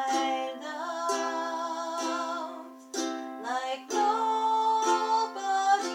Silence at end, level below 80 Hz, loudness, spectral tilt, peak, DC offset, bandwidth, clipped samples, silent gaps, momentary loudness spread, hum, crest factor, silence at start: 0 s; under -90 dBFS; -29 LUFS; 0 dB/octave; -12 dBFS; under 0.1%; 16.5 kHz; under 0.1%; none; 10 LU; none; 16 dB; 0 s